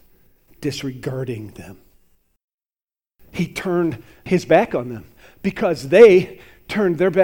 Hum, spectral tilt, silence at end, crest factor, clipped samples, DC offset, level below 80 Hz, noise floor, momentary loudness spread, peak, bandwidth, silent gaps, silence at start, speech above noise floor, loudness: none; -6.5 dB/octave; 0 s; 20 dB; under 0.1%; under 0.1%; -52 dBFS; under -90 dBFS; 22 LU; 0 dBFS; 16.5 kHz; 2.44-2.48 s, 2.54-2.58 s; 0.6 s; over 73 dB; -18 LUFS